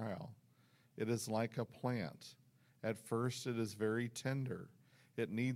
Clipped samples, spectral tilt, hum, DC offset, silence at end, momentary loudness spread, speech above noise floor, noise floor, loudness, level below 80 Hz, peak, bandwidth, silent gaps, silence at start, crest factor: under 0.1%; -6 dB/octave; none; under 0.1%; 0 s; 14 LU; 31 dB; -71 dBFS; -42 LUFS; -80 dBFS; -24 dBFS; 16.5 kHz; none; 0 s; 18 dB